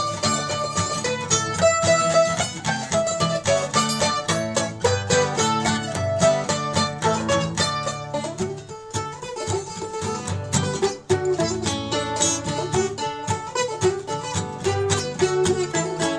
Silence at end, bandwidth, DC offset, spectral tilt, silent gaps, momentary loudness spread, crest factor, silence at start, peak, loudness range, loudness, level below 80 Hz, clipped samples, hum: 0 s; 11 kHz; under 0.1%; -3.5 dB/octave; none; 9 LU; 18 dB; 0 s; -6 dBFS; 5 LU; -22 LUFS; -50 dBFS; under 0.1%; none